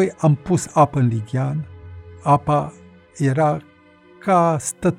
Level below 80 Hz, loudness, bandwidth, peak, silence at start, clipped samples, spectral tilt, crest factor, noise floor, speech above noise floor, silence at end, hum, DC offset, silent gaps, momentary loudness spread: -50 dBFS; -20 LUFS; 14.5 kHz; -2 dBFS; 0 s; under 0.1%; -7 dB/octave; 18 dB; -50 dBFS; 31 dB; 0.05 s; none; under 0.1%; none; 12 LU